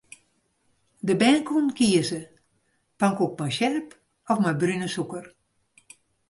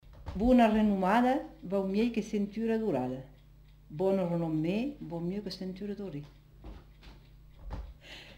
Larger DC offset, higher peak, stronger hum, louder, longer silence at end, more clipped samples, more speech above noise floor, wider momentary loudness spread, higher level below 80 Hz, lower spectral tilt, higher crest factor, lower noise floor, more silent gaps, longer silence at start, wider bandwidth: neither; first, -8 dBFS vs -12 dBFS; second, none vs 50 Hz at -55 dBFS; first, -24 LUFS vs -30 LUFS; first, 1 s vs 0 s; neither; first, 47 dB vs 26 dB; second, 13 LU vs 20 LU; second, -66 dBFS vs -50 dBFS; second, -5 dB/octave vs -7.5 dB/octave; about the same, 18 dB vs 18 dB; first, -70 dBFS vs -56 dBFS; neither; first, 1.05 s vs 0.1 s; second, 11.5 kHz vs 15.5 kHz